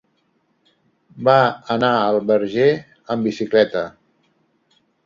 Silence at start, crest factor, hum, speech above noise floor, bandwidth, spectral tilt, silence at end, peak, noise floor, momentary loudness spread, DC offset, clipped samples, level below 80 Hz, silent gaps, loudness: 1.15 s; 18 dB; none; 48 dB; 7.4 kHz; -6.5 dB/octave; 1.15 s; -2 dBFS; -65 dBFS; 11 LU; under 0.1%; under 0.1%; -62 dBFS; none; -18 LUFS